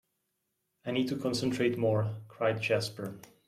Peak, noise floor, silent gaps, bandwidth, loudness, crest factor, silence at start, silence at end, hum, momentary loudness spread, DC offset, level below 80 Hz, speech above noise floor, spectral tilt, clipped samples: -16 dBFS; -81 dBFS; none; 14.5 kHz; -31 LUFS; 16 dB; 0.85 s; 0.2 s; none; 11 LU; under 0.1%; -70 dBFS; 50 dB; -6 dB/octave; under 0.1%